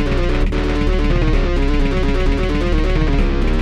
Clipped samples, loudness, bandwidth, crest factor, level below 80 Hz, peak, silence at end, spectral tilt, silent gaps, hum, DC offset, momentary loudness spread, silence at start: under 0.1%; -18 LUFS; 7.4 kHz; 12 dB; -16 dBFS; -4 dBFS; 0 s; -7 dB/octave; none; none; under 0.1%; 1 LU; 0 s